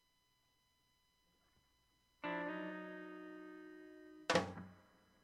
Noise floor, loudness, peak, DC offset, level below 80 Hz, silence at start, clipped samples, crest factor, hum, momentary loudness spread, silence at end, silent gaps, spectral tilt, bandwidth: -79 dBFS; -43 LUFS; -18 dBFS; under 0.1%; -80 dBFS; 2.2 s; under 0.1%; 28 dB; none; 20 LU; 0.4 s; none; -4.5 dB/octave; 14.5 kHz